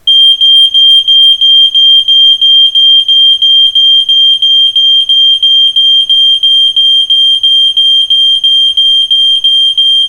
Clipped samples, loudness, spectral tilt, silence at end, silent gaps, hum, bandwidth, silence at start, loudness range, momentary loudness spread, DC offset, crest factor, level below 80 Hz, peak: 0.4%; -2 LUFS; 2.5 dB/octave; 0 s; none; none; 17 kHz; 0.05 s; 2 LU; 3 LU; under 0.1%; 6 dB; -48 dBFS; 0 dBFS